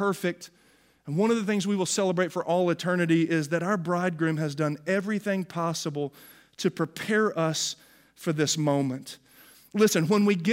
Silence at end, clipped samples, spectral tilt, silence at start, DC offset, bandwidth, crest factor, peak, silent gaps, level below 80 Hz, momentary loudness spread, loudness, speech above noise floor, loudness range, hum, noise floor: 0 s; under 0.1%; -5 dB/octave; 0 s; under 0.1%; 16 kHz; 18 dB; -8 dBFS; none; -74 dBFS; 11 LU; -27 LUFS; 31 dB; 3 LU; none; -57 dBFS